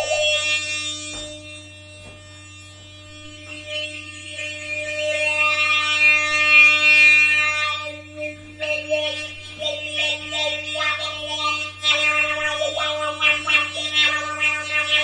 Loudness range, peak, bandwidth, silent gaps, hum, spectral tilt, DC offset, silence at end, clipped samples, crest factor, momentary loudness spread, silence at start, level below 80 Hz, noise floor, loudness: 17 LU; -2 dBFS; 11 kHz; none; none; -1 dB/octave; under 0.1%; 0 s; under 0.1%; 20 dB; 21 LU; 0 s; -58 dBFS; -41 dBFS; -17 LUFS